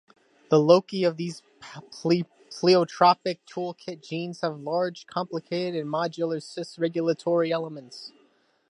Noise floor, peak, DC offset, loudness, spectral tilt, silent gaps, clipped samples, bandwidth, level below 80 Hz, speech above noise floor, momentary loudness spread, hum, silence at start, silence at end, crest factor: -64 dBFS; -4 dBFS; under 0.1%; -25 LUFS; -6 dB/octave; none; under 0.1%; 11.5 kHz; -78 dBFS; 39 dB; 19 LU; none; 0.5 s; 0.6 s; 22 dB